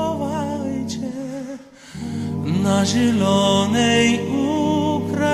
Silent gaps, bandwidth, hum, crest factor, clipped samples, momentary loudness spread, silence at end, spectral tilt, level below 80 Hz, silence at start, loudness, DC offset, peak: none; 15 kHz; none; 14 dB; under 0.1%; 14 LU; 0 s; -5 dB/octave; -52 dBFS; 0 s; -20 LUFS; under 0.1%; -6 dBFS